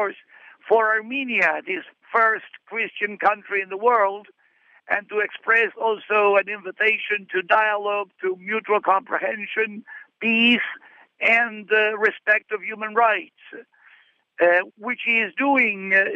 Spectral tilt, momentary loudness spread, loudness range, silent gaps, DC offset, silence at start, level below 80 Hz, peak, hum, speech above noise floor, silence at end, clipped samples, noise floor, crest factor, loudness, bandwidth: -5 dB/octave; 10 LU; 3 LU; none; under 0.1%; 0 s; -80 dBFS; -4 dBFS; none; 37 dB; 0 s; under 0.1%; -58 dBFS; 18 dB; -21 LUFS; 7.8 kHz